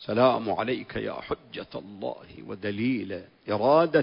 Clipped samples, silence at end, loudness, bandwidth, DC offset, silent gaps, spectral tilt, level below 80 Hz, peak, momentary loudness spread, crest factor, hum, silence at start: under 0.1%; 0 s; -28 LUFS; 5.4 kHz; under 0.1%; none; -10.5 dB/octave; -58 dBFS; -8 dBFS; 16 LU; 18 dB; none; 0 s